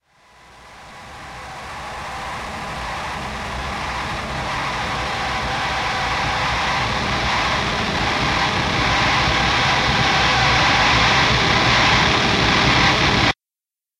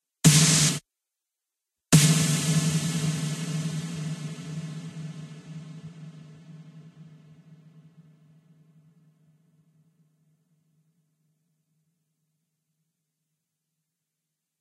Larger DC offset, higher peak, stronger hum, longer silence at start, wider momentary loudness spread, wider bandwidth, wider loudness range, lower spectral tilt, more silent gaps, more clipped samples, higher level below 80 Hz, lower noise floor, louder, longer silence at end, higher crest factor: neither; about the same, -2 dBFS vs -4 dBFS; neither; first, 0.55 s vs 0.25 s; second, 15 LU vs 24 LU; first, 15.5 kHz vs 14 kHz; second, 13 LU vs 24 LU; about the same, -3.5 dB/octave vs -3.5 dB/octave; neither; neither; first, -34 dBFS vs -60 dBFS; first, under -90 dBFS vs -86 dBFS; first, -18 LUFS vs -23 LUFS; second, 0.65 s vs 7.55 s; second, 18 dB vs 26 dB